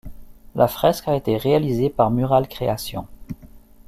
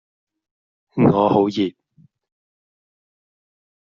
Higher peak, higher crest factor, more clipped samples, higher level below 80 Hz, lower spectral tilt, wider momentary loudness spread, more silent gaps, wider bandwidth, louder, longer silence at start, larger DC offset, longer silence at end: about the same, -2 dBFS vs -2 dBFS; about the same, 18 dB vs 20 dB; neither; first, -44 dBFS vs -56 dBFS; about the same, -6.5 dB/octave vs -7 dB/octave; first, 19 LU vs 10 LU; neither; first, 16 kHz vs 7.2 kHz; about the same, -20 LUFS vs -18 LUFS; second, 0.05 s vs 0.95 s; neither; second, 0.3 s vs 2.1 s